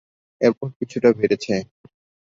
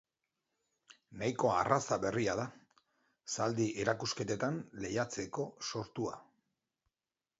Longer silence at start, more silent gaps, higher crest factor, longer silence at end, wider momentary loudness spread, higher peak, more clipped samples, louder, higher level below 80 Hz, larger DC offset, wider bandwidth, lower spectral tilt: second, 0.4 s vs 0.9 s; first, 0.76-0.80 s vs none; second, 20 dB vs 26 dB; second, 0.7 s vs 1.15 s; about the same, 10 LU vs 10 LU; first, -2 dBFS vs -12 dBFS; neither; first, -21 LUFS vs -36 LUFS; first, -60 dBFS vs -68 dBFS; neither; about the same, 7.6 kHz vs 7.6 kHz; first, -6.5 dB/octave vs -4.5 dB/octave